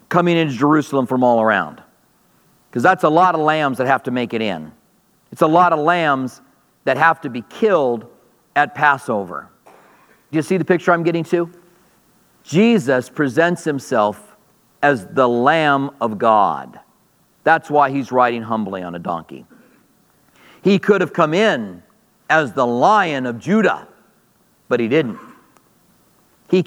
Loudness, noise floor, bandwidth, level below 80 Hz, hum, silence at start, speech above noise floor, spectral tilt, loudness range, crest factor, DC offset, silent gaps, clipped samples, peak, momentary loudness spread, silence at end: -17 LUFS; -58 dBFS; 17.5 kHz; -68 dBFS; none; 0.1 s; 42 dB; -6 dB/octave; 3 LU; 18 dB; under 0.1%; none; under 0.1%; 0 dBFS; 12 LU; 0 s